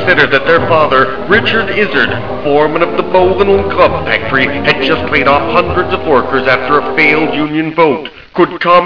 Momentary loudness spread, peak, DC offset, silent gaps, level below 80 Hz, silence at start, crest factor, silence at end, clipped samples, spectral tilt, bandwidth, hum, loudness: 5 LU; 0 dBFS; 5%; none; -36 dBFS; 0 s; 10 dB; 0 s; 0.8%; -7 dB/octave; 5.4 kHz; none; -10 LUFS